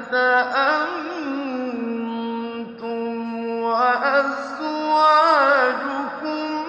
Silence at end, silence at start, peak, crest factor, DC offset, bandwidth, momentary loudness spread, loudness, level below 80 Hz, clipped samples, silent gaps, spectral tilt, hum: 0 s; 0 s; -4 dBFS; 16 dB; under 0.1%; 8.8 kHz; 12 LU; -20 LUFS; -74 dBFS; under 0.1%; none; -4.5 dB/octave; none